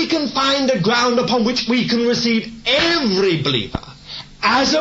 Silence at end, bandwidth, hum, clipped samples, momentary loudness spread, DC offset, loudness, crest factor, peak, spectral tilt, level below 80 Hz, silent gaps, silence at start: 0 s; 8 kHz; none; under 0.1%; 10 LU; under 0.1%; -17 LUFS; 14 dB; -4 dBFS; -4 dB/octave; -44 dBFS; none; 0 s